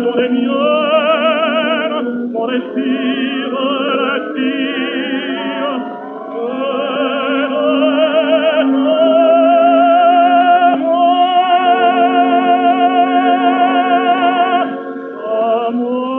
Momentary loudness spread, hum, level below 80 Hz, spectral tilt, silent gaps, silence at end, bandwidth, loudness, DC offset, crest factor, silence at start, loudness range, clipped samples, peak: 9 LU; none; -76 dBFS; -7.5 dB/octave; none; 0 s; 3.8 kHz; -13 LUFS; under 0.1%; 10 dB; 0 s; 7 LU; under 0.1%; -2 dBFS